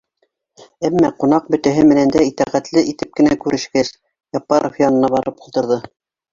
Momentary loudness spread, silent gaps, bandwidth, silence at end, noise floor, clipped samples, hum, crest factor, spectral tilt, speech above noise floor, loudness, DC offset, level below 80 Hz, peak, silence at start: 10 LU; none; 7.6 kHz; 0.45 s; -67 dBFS; under 0.1%; none; 16 dB; -6 dB/octave; 52 dB; -16 LUFS; under 0.1%; -50 dBFS; -2 dBFS; 0.8 s